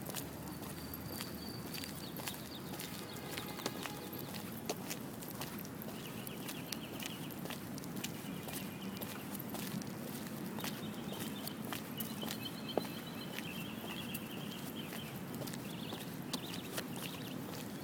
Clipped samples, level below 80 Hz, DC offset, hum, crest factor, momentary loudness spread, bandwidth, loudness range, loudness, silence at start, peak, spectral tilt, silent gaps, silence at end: under 0.1%; -68 dBFS; under 0.1%; none; 28 dB; 3 LU; 19.5 kHz; 2 LU; -43 LUFS; 0 s; -16 dBFS; -4 dB/octave; none; 0 s